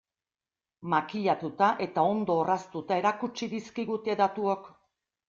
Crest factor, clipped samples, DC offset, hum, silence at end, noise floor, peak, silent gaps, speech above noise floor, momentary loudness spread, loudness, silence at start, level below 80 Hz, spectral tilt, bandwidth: 20 dB; under 0.1%; under 0.1%; none; 0.6 s; under -90 dBFS; -10 dBFS; none; over 62 dB; 9 LU; -29 LUFS; 0.8 s; -72 dBFS; -6 dB/octave; 7.4 kHz